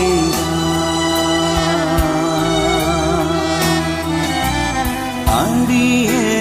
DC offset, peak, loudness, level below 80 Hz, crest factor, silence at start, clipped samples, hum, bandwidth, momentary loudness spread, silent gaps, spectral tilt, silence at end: under 0.1%; -2 dBFS; -16 LUFS; -28 dBFS; 14 dB; 0 s; under 0.1%; none; 15.5 kHz; 4 LU; none; -4.5 dB/octave; 0 s